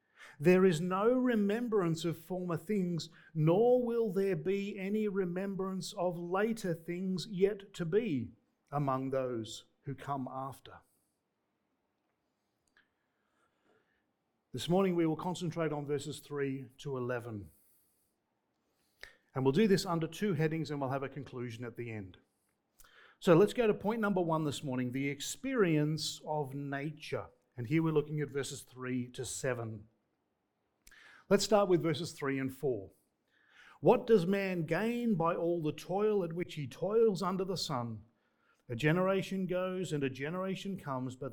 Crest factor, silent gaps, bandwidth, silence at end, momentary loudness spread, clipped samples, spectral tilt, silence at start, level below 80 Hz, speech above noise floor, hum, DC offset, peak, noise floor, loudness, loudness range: 22 dB; none; 19 kHz; 0 s; 14 LU; under 0.1%; -6 dB/octave; 0.2 s; -66 dBFS; 49 dB; none; under 0.1%; -12 dBFS; -82 dBFS; -34 LUFS; 8 LU